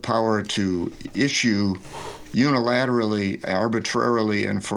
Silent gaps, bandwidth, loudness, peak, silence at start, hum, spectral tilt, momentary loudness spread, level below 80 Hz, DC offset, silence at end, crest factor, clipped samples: none; 12 kHz; -22 LUFS; -8 dBFS; 0.05 s; none; -5 dB/octave; 8 LU; -54 dBFS; under 0.1%; 0 s; 14 dB; under 0.1%